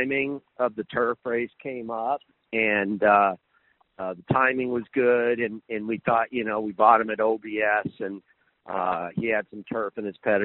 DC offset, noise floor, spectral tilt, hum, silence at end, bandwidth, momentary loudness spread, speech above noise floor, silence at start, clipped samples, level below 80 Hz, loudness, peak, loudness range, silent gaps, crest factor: under 0.1%; -66 dBFS; -4 dB/octave; none; 0 s; 4.2 kHz; 13 LU; 41 dB; 0 s; under 0.1%; -64 dBFS; -25 LUFS; -4 dBFS; 3 LU; none; 22 dB